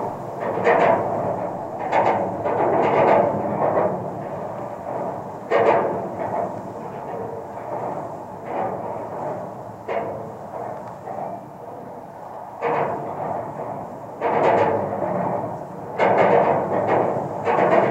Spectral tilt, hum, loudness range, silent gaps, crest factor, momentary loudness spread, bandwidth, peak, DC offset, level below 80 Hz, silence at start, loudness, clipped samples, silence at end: -7.5 dB/octave; none; 10 LU; none; 20 dB; 15 LU; 15 kHz; -2 dBFS; under 0.1%; -60 dBFS; 0 s; -23 LUFS; under 0.1%; 0 s